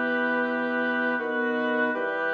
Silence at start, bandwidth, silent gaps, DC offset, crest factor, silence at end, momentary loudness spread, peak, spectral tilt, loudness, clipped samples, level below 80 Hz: 0 s; 6.2 kHz; none; under 0.1%; 14 dB; 0 s; 2 LU; -12 dBFS; -6 dB/octave; -26 LUFS; under 0.1%; -78 dBFS